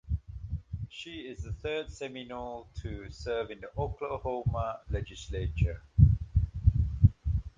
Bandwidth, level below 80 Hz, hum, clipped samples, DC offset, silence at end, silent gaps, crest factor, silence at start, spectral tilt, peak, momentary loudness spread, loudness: 7.6 kHz; -36 dBFS; none; under 0.1%; under 0.1%; 0.1 s; none; 24 dB; 0.05 s; -7.5 dB/octave; -6 dBFS; 16 LU; -32 LUFS